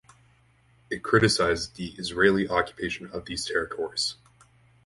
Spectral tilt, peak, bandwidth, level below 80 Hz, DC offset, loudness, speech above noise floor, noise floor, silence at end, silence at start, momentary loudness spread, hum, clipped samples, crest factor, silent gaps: -4 dB/octave; -4 dBFS; 11.5 kHz; -52 dBFS; under 0.1%; -26 LUFS; 35 dB; -61 dBFS; 0.75 s; 0.9 s; 13 LU; none; under 0.1%; 22 dB; none